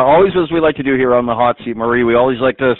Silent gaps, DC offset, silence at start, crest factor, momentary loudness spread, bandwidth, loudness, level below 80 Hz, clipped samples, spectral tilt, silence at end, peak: none; under 0.1%; 0 s; 12 dB; 5 LU; 4.2 kHz; -13 LUFS; -42 dBFS; under 0.1%; -4.5 dB/octave; 0.05 s; 0 dBFS